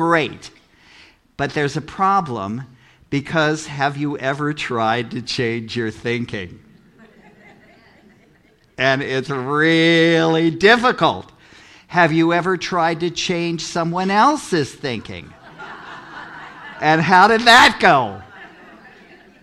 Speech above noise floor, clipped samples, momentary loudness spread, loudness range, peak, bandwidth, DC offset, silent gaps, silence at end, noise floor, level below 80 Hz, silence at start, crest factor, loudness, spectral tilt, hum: 37 dB; under 0.1%; 22 LU; 10 LU; 0 dBFS; 15 kHz; under 0.1%; none; 0.55 s; -54 dBFS; -52 dBFS; 0 s; 18 dB; -17 LUFS; -4.5 dB/octave; none